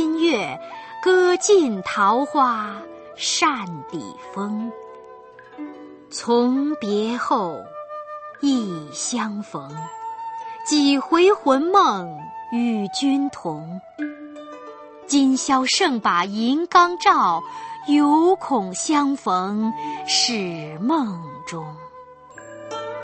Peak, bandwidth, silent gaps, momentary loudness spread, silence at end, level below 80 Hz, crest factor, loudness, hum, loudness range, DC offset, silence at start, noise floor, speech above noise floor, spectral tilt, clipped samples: -2 dBFS; 8.8 kHz; none; 19 LU; 0 s; -66 dBFS; 20 dB; -20 LUFS; none; 7 LU; under 0.1%; 0 s; -43 dBFS; 23 dB; -3.5 dB/octave; under 0.1%